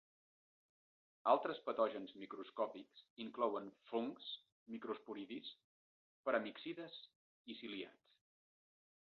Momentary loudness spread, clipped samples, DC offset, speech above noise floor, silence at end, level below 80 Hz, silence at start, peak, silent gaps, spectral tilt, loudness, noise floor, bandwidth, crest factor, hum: 17 LU; under 0.1%; under 0.1%; over 47 dB; 1.25 s; under -90 dBFS; 1.25 s; -20 dBFS; 3.10-3.16 s, 4.52-4.66 s, 5.64-6.24 s, 7.15-7.45 s; -2 dB/octave; -44 LUFS; under -90 dBFS; 5.8 kHz; 26 dB; none